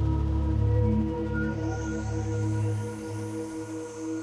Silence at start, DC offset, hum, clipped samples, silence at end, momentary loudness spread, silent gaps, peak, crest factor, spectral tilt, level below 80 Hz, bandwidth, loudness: 0 s; under 0.1%; none; under 0.1%; 0 s; 10 LU; none; -14 dBFS; 14 dB; -8 dB/octave; -34 dBFS; 10.5 kHz; -29 LUFS